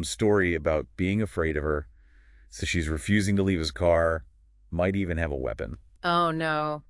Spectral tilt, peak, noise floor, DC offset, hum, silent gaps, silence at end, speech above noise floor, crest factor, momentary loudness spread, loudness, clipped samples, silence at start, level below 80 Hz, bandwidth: -5.5 dB/octave; -10 dBFS; -54 dBFS; under 0.1%; none; none; 0.1 s; 28 dB; 16 dB; 10 LU; -27 LUFS; under 0.1%; 0 s; -42 dBFS; 12 kHz